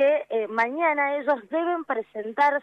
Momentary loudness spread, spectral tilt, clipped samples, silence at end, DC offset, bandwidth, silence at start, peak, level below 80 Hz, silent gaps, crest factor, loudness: 7 LU; -5 dB/octave; under 0.1%; 0 s; under 0.1%; 6.8 kHz; 0 s; -10 dBFS; -80 dBFS; none; 14 dB; -25 LUFS